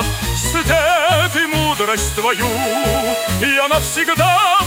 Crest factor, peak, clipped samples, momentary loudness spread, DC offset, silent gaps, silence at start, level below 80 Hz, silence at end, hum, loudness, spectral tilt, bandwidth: 14 dB; -2 dBFS; under 0.1%; 4 LU; under 0.1%; none; 0 s; -30 dBFS; 0 s; none; -15 LUFS; -3 dB/octave; 18.5 kHz